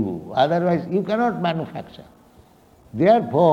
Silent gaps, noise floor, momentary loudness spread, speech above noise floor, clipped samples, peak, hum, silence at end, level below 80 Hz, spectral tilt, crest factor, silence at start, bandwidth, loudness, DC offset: none; -52 dBFS; 18 LU; 32 dB; under 0.1%; -4 dBFS; none; 0 s; -58 dBFS; -8 dB/octave; 18 dB; 0 s; 7.6 kHz; -20 LUFS; under 0.1%